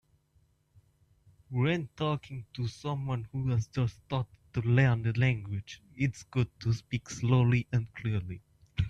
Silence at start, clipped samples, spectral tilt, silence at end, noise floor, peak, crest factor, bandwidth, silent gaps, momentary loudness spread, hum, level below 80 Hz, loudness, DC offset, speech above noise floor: 1.5 s; under 0.1%; -7 dB/octave; 0 s; -69 dBFS; -14 dBFS; 18 dB; 8 kHz; none; 12 LU; none; -54 dBFS; -31 LUFS; under 0.1%; 39 dB